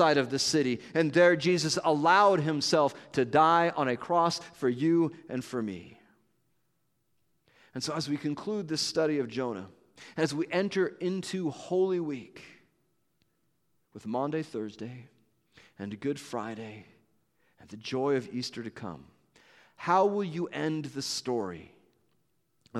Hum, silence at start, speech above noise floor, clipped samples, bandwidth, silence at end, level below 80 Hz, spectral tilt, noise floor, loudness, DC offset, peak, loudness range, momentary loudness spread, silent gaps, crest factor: none; 0 s; 49 dB; under 0.1%; 13.5 kHz; 0 s; -74 dBFS; -4.5 dB/octave; -77 dBFS; -29 LUFS; under 0.1%; -10 dBFS; 13 LU; 19 LU; none; 20 dB